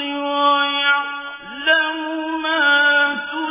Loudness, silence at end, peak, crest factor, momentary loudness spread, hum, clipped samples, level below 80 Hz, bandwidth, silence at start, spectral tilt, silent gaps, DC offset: -17 LUFS; 0 s; -4 dBFS; 14 dB; 11 LU; none; under 0.1%; -64 dBFS; 3.8 kHz; 0 s; -4.5 dB/octave; none; under 0.1%